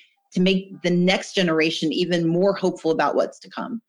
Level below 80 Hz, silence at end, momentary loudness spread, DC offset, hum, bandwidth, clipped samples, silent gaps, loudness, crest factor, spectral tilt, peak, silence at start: -64 dBFS; 0.1 s; 7 LU; under 0.1%; none; 11 kHz; under 0.1%; none; -21 LUFS; 14 dB; -5.5 dB/octave; -6 dBFS; 0.35 s